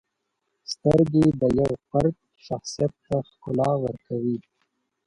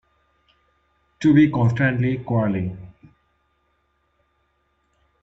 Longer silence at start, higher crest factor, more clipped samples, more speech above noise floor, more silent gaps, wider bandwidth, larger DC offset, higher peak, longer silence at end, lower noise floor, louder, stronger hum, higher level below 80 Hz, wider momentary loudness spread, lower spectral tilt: second, 0.7 s vs 1.2 s; about the same, 18 dB vs 18 dB; neither; first, 55 dB vs 49 dB; neither; first, 11.5 kHz vs 7.8 kHz; neither; about the same, -6 dBFS vs -4 dBFS; second, 0.65 s vs 2.35 s; first, -78 dBFS vs -68 dBFS; second, -24 LUFS vs -20 LUFS; neither; about the same, -50 dBFS vs -54 dBFS; about the same, 14 LU vs 12 LU; about the same, -7.5 dB/octave vs -8.5 dB/octave